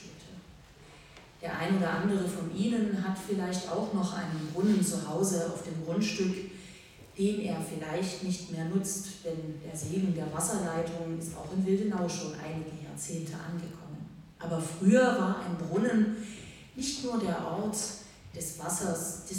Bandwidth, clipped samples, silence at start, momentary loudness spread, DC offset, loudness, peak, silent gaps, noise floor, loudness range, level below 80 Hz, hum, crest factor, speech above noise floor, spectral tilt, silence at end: 16.5 kHz; under 0.1%; 0 s; 16 LU; under 0.1%; -32 LUFS; -12 dBFS; none; -53 dBFS; 5 LU; -62 dBFS; none; 20 dB; 22 dB; -5 dB/octave; 0 s